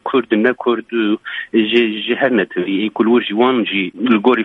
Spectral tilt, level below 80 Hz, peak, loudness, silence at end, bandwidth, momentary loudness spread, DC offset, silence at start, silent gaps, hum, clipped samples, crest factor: -7.5 dB/octave; -64 dBFS; 0 dBFS; -16 LUFS; 0 s; 5 kHz; 5 LU; under 0.1%; 0.05 s; none; none; under 0.1%; 14 dB